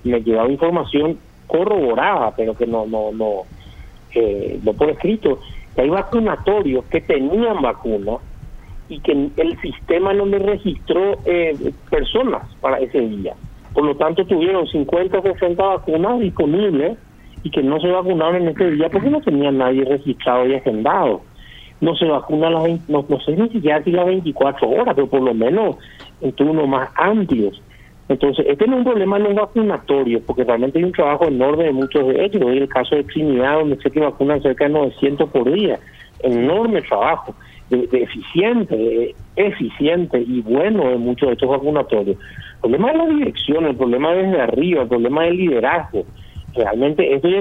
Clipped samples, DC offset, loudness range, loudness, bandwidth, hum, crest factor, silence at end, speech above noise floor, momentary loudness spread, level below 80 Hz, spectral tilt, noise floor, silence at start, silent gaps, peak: under 0.1%; under 0.1%; 3 LU; -17 LUFS; 4.7 kHz; none; 16 dB; 0 s; 23 dB; 6 LU; -40 dBFS; -8.5 dB/octave; -40 dBFS; 0.05 s; none; 0 dBFS